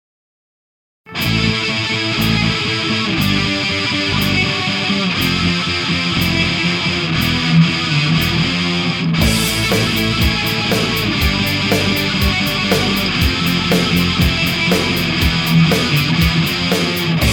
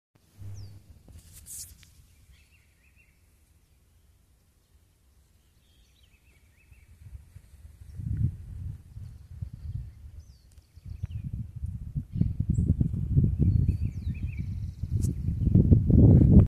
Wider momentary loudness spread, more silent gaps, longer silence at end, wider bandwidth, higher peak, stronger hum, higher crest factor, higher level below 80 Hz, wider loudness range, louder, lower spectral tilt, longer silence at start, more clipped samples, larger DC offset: second, 3 LU vs 26 LU; neither; about the same, 0 s vs 0 s; first, 19.5 kHz vs 14.5 kHz; first, 0 dBFS vs -4 dBFS; neither; second, 14 dB vs 24 dB; first, -30 dBFS vs -36 dBFS; second, 1 LU vs 22 LU; first, -15 LUFS vs -26 LUFS; second, -4.5 dB/octave vs -9.5 dB/octave; first, 1.05 s vs 0.4 s; neither; neither